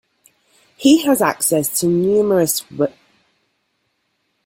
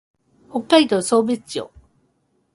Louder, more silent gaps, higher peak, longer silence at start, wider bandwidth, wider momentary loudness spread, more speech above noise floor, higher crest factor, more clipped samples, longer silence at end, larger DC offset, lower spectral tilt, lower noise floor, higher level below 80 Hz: first, -16 LUFS vs -19 LUFS; neither; about the same, -2 dBFS vs 0 dBFS; first, 0.8 s vs 0.55 s; first, 16.5 kHz vs 11.5 kHz; second, 8 LU vs 15 LU; first, 53 dB vs 48 dB; about the same, 18 dB vs 20 dB; neither; first, 1.55 s vs 0.9 s; neither; about the same, -4 dB/octave vs -4 dB/octave; about the same, -69 dBFS vs -66 dBFS; about the same, -58 dBFS vs -60 dBFS